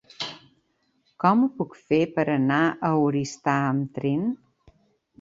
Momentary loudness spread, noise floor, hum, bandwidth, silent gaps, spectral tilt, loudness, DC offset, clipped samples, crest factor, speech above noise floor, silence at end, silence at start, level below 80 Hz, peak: 12 LU; -69 dBFS; none; 7.8 kHz; none; -6.5 dB/octave; -24 LUFS; under 0.1%; under 0.1%; 20 dB; 46 dB; 0.85 s; 0.2 s; -64 dBFS; -6 dBFS